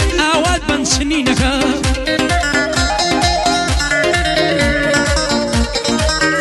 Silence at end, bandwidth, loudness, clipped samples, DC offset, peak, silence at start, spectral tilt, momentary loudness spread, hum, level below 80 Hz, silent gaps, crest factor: 0 s; 12.5 kHz; -14 LUFS; under 0.1%; under 0.1%; 0 dBFS; 0 s; -3.5 dB/octave; 3 LU; none; -24 dBFS; none; 14 dB